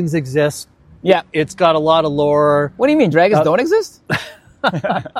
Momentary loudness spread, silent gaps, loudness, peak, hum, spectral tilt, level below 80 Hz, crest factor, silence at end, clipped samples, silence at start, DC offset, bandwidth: 10 LU; none; -15 LUFS; 0 dBFS; none; -6 dB/octave; -52 dBFS; 16 dB; 0 s; under 0.1%; 0 s; under 0.1%; 14.5 kHz